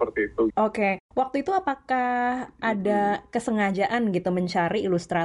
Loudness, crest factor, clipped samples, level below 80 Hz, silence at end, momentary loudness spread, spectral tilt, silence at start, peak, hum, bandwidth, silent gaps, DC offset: -25 LUFS; 14 dB; under 0.1%; -56 dBFS; 0 s; 4 LU; -6.5 dB/octave; 0 s; -10 dBFS; none; 11.5 kHz; 1.00-1.09 s; under 0.1%